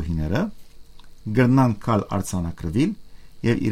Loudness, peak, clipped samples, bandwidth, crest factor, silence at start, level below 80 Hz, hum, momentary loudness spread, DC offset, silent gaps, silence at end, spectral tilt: -23 LUFS; -4 dBFS; under 0.1%; 14.5 kHz; 18 dB; 0 s; -40 dBFS; none; 10 LU; under 0.1%; none; 0 s; -7 dB/octave